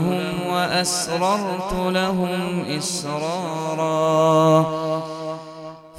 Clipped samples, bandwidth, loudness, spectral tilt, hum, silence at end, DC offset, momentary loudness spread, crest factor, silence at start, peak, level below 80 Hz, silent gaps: under 0.1%; 16 kHz; -21 LUFS; -4.5 dB/octave; none; 0 s; under 0.1%; 12 LU; 18 dB; 0 s; -4 dBFS; -48 dBFS; none